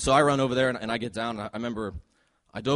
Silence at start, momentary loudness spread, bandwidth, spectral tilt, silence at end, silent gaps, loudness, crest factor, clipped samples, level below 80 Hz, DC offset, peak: 0 s; 15 LU; 11.5 kHz; -5 dB/octave; 0 s; none; -27 LUFS; 18 dB; under 0.1%; -48 dBFS; under 0.1%; -8 dBFS